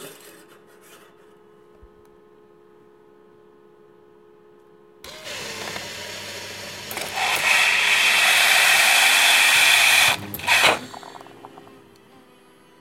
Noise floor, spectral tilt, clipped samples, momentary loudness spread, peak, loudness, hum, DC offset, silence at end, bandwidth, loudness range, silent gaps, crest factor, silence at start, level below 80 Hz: -52 dBFS; 1 dB/octave; under 0.1%; 20 LU; -2 dBFS; -15 LUFS; none; under 0.1%; 1.35 s; 16 kHz; 21 LU; none; 20 dB; 0 s; -64 dBFS